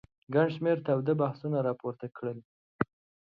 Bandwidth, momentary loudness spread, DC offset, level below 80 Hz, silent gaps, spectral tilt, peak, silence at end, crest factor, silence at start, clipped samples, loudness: 5.4 kHz; 11 LU; under 0.1%; -68 dBFS; 2.45-2.79 s; -10 dB/octave; -12 dBFS; 0.45 s; 20 dB; 0.3 s; under 0.1%; -31 LUFS